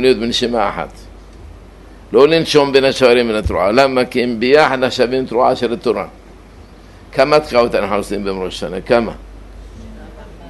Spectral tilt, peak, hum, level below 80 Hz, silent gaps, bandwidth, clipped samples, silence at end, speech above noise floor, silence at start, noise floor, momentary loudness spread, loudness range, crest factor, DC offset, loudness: -5 dB/octave; 0 dBFS; none; -36 dBFS; none; 12.5 kHz; under 0.1%; 0 s; 25 dB; 0 s; -39 dBFS; 13 LU; 5 LU; 16 dB; under 0.1%; -14 LUFS